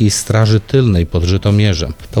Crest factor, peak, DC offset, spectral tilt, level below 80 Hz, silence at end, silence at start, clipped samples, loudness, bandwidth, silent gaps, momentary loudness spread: 12 dB; -2 dBFS; under 0.1%; -5.5 dB/octave; -28 dBFS; 0 s; 0 s; under 0.1%; -13 LUFS; 13.5 kHz; none; 4 LU